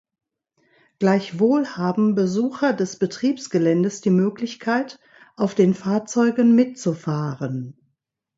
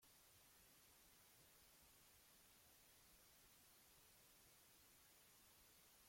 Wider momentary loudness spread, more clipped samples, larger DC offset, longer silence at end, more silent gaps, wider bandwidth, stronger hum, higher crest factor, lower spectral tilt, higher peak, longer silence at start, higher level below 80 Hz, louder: first, 8 LU vs 0 LU; neither; neither; first, 0.65 s vs 0 s; neither; second, 7.8 kHz vs 16.5 kHz; neither; about the same, 16 dB vs 14 dB; first, -6.5 dB/octave vs -1.5 dB/octave; first, -4 dBFS vs -58 dBFS; first, 1 s vs 0 s; first, -66 dBFS vs -86 dBFS; first, -21 LUFS vs -69 LUFS